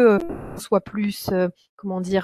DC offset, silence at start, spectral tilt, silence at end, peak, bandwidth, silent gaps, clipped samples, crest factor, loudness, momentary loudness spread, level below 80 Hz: under 0.1%; 0 s; -6.5 dB/octave; 0 s; -4 dBFS; 14.5 kHz; 1.69-1.77 s; under 0.1%; 18 dB; -24 LUFS; 11 LU; -50 dBFS